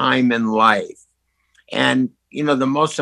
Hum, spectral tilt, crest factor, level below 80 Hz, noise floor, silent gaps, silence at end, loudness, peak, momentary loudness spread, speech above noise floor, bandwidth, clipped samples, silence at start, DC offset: none; -5 dB/octave; 18 dB; -64 dBFS; -67 dBFS; none; 0 s; -18 LUFS; 0 dBFS; 10 LU; 50 dB; 11.5 kHz; under 0.1%; 0 s; under 0.1%